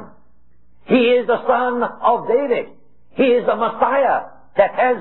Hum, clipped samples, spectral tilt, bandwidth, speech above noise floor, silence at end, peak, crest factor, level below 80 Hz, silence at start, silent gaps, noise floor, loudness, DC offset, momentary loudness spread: none; under 0.1%; -9 dB/octave; 4.2 kHz; 42 dB; 0 s; -2 dBFS; 16 dB; -58 dBFS; 0 s; none; -58 dBFS; -17 LUFS; 0.8%; 7 LU